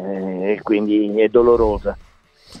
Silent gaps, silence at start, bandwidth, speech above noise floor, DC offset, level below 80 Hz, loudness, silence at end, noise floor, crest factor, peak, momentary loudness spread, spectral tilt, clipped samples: none; 0 s; 5.8 kHz; 32 dB; under 0.1%; -36 dBFS; -17 LUFS; 0 s; -48 dBFS; 16 dB; -2 dBFS; 12 LU; -8 dB/octave; under 0.1%